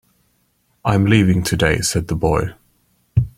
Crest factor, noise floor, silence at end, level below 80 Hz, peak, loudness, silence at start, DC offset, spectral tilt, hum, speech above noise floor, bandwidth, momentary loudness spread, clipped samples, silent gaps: 16 dB; -63 dBFS; 0.1 s; -36 dBFS; -2 dBFS; -17 LUFS; 0.85 s; under 0.1%; -5.5 dB/octave; none; 47 dB; 16.5 kHz; 8 LU; under 0.1%; none